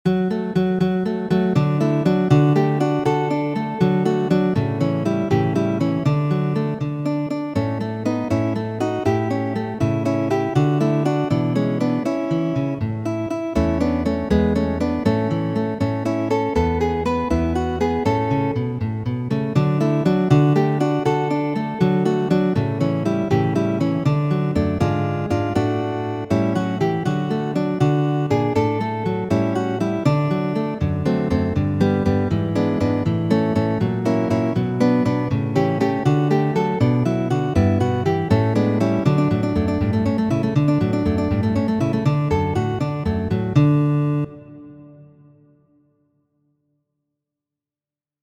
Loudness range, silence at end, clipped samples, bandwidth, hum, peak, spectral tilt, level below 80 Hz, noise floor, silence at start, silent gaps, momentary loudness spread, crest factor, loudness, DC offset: 3 LU; 3.15 s; under 0.1%; 9.6 kHz; none; -2 dBFS; -8.5 dB/octave; -40 dBFS; under -90 dBFS; 0.05 s; none; 5 LU; 16 dB; -20 LUFS; under 0.1%